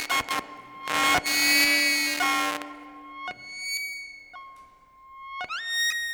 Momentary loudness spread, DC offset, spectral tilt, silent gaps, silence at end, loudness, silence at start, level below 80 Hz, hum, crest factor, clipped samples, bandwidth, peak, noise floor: 24 LU; under 0.1%; 0 dB/octave; none; 0 s; -23 LUFS; 0 s; -62 dBFS; none; 16 dB; under 0.1%; over 20 kHz; -12 dBFS; -53 dBFS